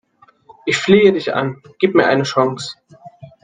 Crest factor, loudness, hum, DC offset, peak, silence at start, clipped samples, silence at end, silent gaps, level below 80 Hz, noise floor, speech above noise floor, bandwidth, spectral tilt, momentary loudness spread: 16 dB; -15 LUFS; none; under 0.1%; 0 dBFS; 0.65 s; under 0.1%; 0.15 s; none; -58 dBFS; -48 dBFS; 33 dB; 9.4 kHz; -5.5 dB/octave; 15 LU